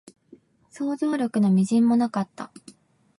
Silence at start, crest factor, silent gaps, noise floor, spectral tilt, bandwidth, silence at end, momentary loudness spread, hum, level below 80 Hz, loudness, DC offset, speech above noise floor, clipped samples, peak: 0.75 s; 14 dB; none; -54 dBFS; -7.5 dB/octave; 11.5 kHz; 0.75 s; 15 LU; none; -72 dBFS; -23 LUFS; under 0.1%; 32 dB; under 0.1%; -12 dBFS